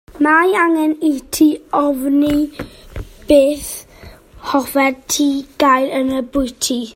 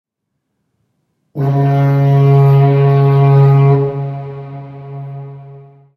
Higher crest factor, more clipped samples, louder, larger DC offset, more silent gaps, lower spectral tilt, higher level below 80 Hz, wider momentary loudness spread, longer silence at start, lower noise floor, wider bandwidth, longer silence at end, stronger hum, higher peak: about the same, 16 dB vs 12 dB; neither; second, -15 LUFS vs -11 LUFS; neither; neither; second, -3.5 dB/octave vs -10.5 dB/octave; first, -40 dBFS vs -52 dBFS; second, 17 LU vs 21 LU; second, 0.15 s vs 1.35 s; second, -40 dBFS vs -72 dBFS; first, 16.5 kHz vs 4.3 kHz; second, 0.05 s vs 0.35 s; neither; about the same, 0 dBFS vs 0 dBFS